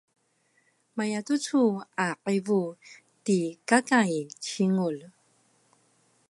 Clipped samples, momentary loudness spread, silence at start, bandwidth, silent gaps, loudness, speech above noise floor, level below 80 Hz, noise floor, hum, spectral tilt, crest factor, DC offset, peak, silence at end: under 0.1%; 11 LU; 0.95 s; 11.5 kHz; none; -27 LUFS; 43 dB; -80 dBFS; -70 dBFS; none; -5 dB/octave; 22 dB; under 0.1%; -6 dBFS; 1.2 s